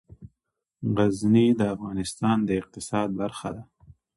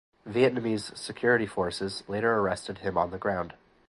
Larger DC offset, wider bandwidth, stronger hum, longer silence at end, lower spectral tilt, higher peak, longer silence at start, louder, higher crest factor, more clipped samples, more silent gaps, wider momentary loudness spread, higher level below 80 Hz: neither; about the same, 11.5 kHz vs 11.5 kHz; neither; first, 0.55 s vs 0.35 s; about the same, -6.5 dB/octave vs -5.5 dB/octave; about the same, -8 dBFS vs -10 dBFS; about the same, 0.2 s vs 0.25 s; first, -25 LUFS vs -29 LUFS; about the same, 18 dB vs 20 dB; neither; neither; first, 13 LU vs 9 LU; about the same, -54 dBFS vs -56 dBFS